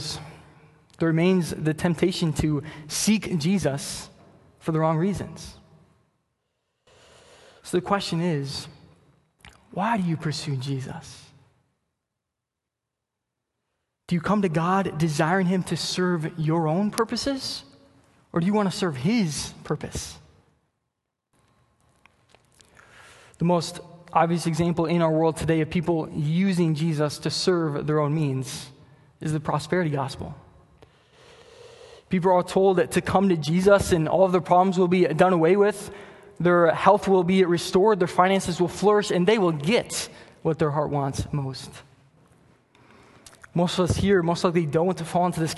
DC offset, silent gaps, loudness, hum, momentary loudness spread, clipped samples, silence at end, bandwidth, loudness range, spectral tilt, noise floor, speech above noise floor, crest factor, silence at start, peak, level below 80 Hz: under 0.1%; none; -23 LUFS; none; 14 LU; under 0.1%; 0 s; 12.5 kHz; 10 LU; -6 dB/octave; -85 dBFS; 62 dB; 22 dB; 0 s; -2 dBFS; -50 dBFS